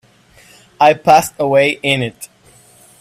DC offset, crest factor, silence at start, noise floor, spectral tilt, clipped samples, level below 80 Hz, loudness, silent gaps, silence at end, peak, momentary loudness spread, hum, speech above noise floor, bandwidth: under 0.1%; 16 dB; 0.8 s; -48 dBFS; -4 dB/octave; under 0.1%; -54 dBFS; -13 LUFS; none; 0.75 s; 0 dBFS; 17 LU; none; 35 dB; 16 kHz